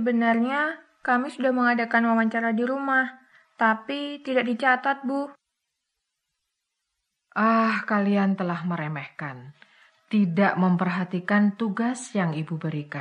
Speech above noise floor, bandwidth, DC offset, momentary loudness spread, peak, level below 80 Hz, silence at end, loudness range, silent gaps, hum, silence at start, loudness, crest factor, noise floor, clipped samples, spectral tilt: 57 dB; 10 kHz; under 0.1%; 10 LU; -8 dBFS; -78 dBFS; 0 s; 4 LU; none; none; 0 s; -24 LUFS; 18 dB; -81 dBFS; under 0.1%; -6.5 dB/octave